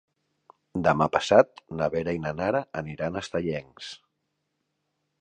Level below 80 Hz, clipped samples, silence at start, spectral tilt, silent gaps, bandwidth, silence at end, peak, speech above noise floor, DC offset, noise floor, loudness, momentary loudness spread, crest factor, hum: -54 dBFS; under 0.1%; 0.75 s; -6 dB/octave; none; 9.6 kHz; 1.25 s; -4 dBFS; 53 dB; under 0.1%; -79 dBFS; -26 LUFS; 18 LU; 24 dB; none